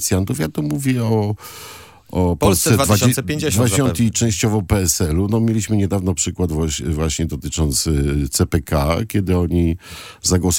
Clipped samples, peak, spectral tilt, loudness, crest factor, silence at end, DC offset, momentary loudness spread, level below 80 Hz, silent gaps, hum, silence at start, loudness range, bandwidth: under 0.1%; 0 dBFS; -5 dB/octave; -18 LUFS; 16 dB; 0 s; under 0.1%; 7 LU; -34 dBFS; none; none; 0 s; 3 LU; 17 kHz